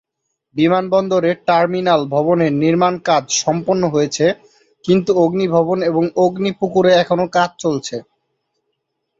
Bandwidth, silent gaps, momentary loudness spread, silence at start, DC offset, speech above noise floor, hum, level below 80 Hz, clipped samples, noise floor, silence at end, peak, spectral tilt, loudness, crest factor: 8 kHz; none; 6 LU; 0.55 s; under 0.1%; 59 dB; none; -58 dBFS; under 0.1%; -74 dBFS; 1.2 s; -2 dBFS; -5 dB/octave; -16 LUFS; 14 dB